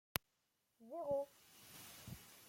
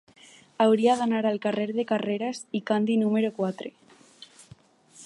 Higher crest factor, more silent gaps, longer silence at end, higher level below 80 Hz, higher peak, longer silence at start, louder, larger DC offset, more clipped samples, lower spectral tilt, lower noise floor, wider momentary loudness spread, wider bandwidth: first, 36 dB vs 18 dB; neither; about the same, 0 s vs 0 s; first, -70 dBFS vs -76 dBFS; second, -12 dBFS vs -8 dBFS; first, 0.8 s vs 0.6 s; second, -47 LUFS vs -25 LUFS; neither; neither; second, -3.5 dB/octave vs -6 dB/octave; first, -85 dBFS vs -54 dBFS; first, 17 LU vs 9 LU; first, 16.5 kHz vs 11 kHz